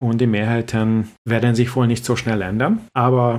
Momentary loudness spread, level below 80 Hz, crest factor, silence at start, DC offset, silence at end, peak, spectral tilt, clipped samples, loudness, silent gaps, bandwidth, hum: 3 LU; -50 dBFS; 16 dB; 0 s; under 0.1%; 0 s; -2 dBFS; -7 dB/octave; under 0.1%; -19 LUFS; 1.18-1.25 s; 14 kHz; none